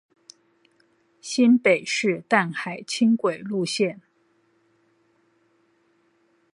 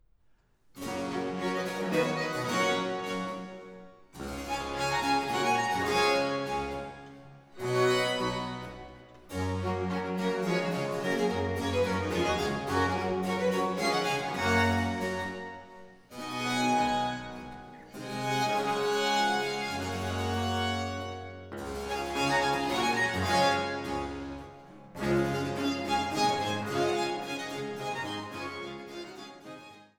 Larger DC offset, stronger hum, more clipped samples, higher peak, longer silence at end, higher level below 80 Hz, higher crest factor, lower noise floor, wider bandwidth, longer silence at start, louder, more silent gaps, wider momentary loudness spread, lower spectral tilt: neither; neither; neither; first, -4 dBFS vs -12 dBFS; first, 2.6 s vs 0.15 s; second, -78 dBFS vs -56 dBFS; about the same, 22 dB vs 18 dB; about the same, -65 dBFS vs -65 dBFS; second, 11.5 kHz vs over 20 kHz; first, 1.25 s vs 0.75 s; first, -22 LUFS vs -30 LUFS; neither; second, 11 LU vs 17 LU; about the same, -4.5 dB/octave vs -4.5 dB/octave